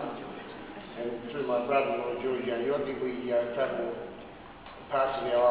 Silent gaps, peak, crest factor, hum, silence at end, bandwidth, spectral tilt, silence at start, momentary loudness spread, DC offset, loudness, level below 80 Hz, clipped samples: none; -14 dBFS; 18 dB; none; 0 s; 4 kHz; -9 dB/octave; 0 s; 16 LU; under 0.1%; -31 LUFS; -62 dBFS; under 0.1%